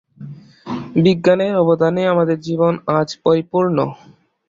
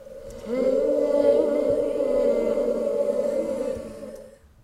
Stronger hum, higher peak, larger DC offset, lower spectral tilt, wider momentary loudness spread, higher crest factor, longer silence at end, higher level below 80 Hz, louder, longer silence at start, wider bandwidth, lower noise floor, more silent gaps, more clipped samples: neither; first, -2 dBFS vs -8 dBFS; neither; about the same, -7.5 dB/octave vs -6.5 dB/octave; about the same, 16 LU vs 18 LU; about the same, 16 dB vs 16 dB; first, 0.55 s vs 0.35 s; second, -56 dBFS vs -50 dBFS; first, -16 LUFS vs -23 LUFS; first, 0.2 s vs 0 s; second, 7.6 kHz vs 12.5 kHz; second, -36 dBFS vs -45 dBFS; neither; neither